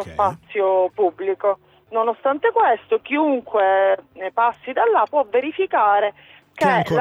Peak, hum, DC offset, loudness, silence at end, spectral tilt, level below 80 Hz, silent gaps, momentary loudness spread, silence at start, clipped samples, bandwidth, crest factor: -4 dBFS; none; under 0.1%; -20 LUFS; 0 s; -6.5 dB/octave; -60 dBFS; none; 6 LU; 0 s; under 0.1%; 10.5 kHz; 14 dB